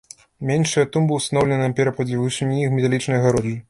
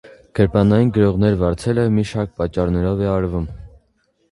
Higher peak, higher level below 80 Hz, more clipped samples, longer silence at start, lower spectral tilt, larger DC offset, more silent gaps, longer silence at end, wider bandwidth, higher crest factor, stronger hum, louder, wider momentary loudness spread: second, -4 dBFS vs 0 dBFS; second, -52 dBFS vs -34 dBFS; neither; about the same, 0.4 s vs 0.35 s; second, -6 dB/octave vs -8.5 dB/octave; neither; neither; second, 0.1 s vs 0.65 s; about the same, 11.5 kHz vs 11.5 kHz; about the same, 16 dB vs 18 dB; neither; about the same, -20 LUFS vs -18 LUFS; second, 4 LU vs 9 LU